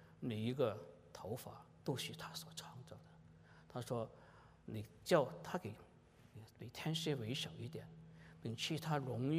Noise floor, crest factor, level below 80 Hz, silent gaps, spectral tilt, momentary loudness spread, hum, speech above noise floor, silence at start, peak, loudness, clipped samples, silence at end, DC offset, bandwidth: -65 dBFS; 24 dB; -74 dBFS; none; -5.5 dB/octave; 21 LU; none; 22 dB; 0 s; -20 dBFS; -43 LUFS; under 0.1%; 0 s; under 0.1%; 15.5 kHz